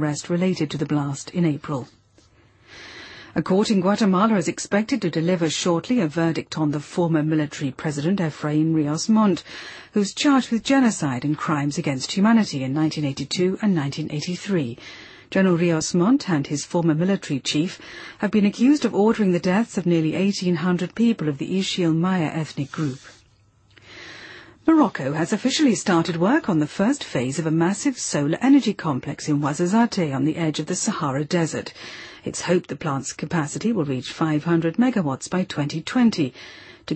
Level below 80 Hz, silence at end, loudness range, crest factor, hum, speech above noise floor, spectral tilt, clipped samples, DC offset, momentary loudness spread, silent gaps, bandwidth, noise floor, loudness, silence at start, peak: -60 dBFS; 0 s; 4 LU; 16 dB; none; 36 dB; -5.5 dB/octave; under 0.1%; under 0.1%; 10 LU; none; 8.8 kHz; -57 dBFS; -22 LUFS; 0 s; -6 dBFS